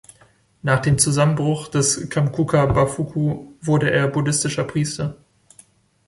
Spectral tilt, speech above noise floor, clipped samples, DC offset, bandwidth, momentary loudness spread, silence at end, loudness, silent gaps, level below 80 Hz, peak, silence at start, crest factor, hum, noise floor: -5 dB/octave; 36 dB; under 0.1%; under 0.1%; 11.5 kHz; 8 LU; 0.9 s; -20 LUFS; none; -44 dBFS; -2 dBFS; 0.65 s; 18 dB; none; -55 dBFS